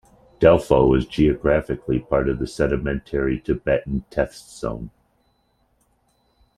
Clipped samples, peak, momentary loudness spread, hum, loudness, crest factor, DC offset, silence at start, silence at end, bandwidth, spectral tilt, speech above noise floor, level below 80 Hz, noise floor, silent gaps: under 0.1%; -2 dBFS; 13 LU; none; -21 LUFS; 20 dB; under 0.1%; 0.4 s; 1.7 s; 13 kHz; -7.5 dB/octave; 45 dB; -36 dBFS; -65 dBFS; none